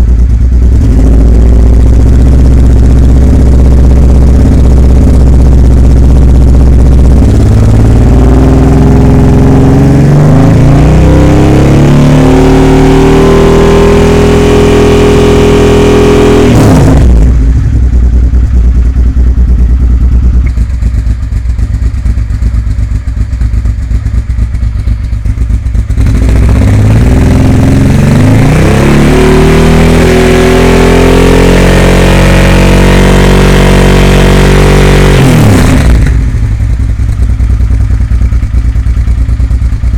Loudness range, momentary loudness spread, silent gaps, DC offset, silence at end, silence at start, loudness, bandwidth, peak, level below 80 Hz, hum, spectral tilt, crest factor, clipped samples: 6 LU; 7 LU; none; under 0.1%; 0 s; 0 s; -5 LUFS; 13.5 kHz; 0 dBFS; -6 dBFS; none; -7 dB/octave; 4 dB; 7%